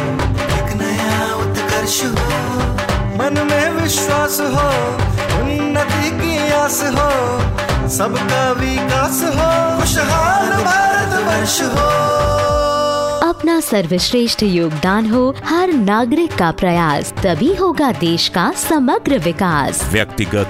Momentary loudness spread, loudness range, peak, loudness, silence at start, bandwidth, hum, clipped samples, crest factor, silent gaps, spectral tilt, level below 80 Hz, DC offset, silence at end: 4 LU; 2 LU; 0 dBFS; -15 LUFS; 0 s; 16.5 kHz; none; under 0.1%; 16 dB; none; -4.5 dB/octave; -30 dBFS; under 0.1%; 0 s